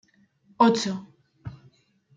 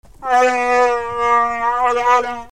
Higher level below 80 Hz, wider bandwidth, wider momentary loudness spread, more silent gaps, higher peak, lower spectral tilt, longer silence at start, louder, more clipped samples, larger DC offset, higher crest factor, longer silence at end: second, -64 dBFS vs -48 dBFS; second, 9 kHz vs 13.5 kHz; first, 23 LU vs 4 LU; neither; second, -6 dBFS vs -2 dBFS; first, -5 dB/octave vs -2.5 dB/octave; first, 0.6 s vs 0.2 s; second, -23 LUFS vs -16 LUFS; neither; second, under 0.1% vs 0.9%; first, 22 dB vs 14 dB; first, 0.65 s vs 0.15 s